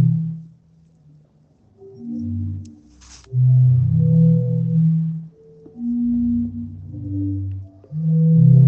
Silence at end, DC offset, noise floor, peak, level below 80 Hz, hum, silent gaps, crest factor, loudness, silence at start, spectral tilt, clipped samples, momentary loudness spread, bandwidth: 0 s; under 0.1%; -55 dBFS; -4 dBFS; -50 dBFS; none; none; 14 dB; -19 LUFS; 0 s; -11.5 dB/octave; under 0.1%; 18 LU; 1 kHz